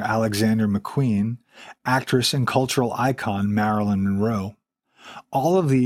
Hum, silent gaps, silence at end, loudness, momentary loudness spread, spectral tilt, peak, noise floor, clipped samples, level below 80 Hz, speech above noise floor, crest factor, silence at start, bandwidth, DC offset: none; none; 0 s; -22 LUFS; 8 LU; -6 dB/octave; -4 dBFS; -52 dBFS; under 0.1%; -58 dBFS; 30 dB; 18 dB; 0 s; 16 kHz; under 0.1%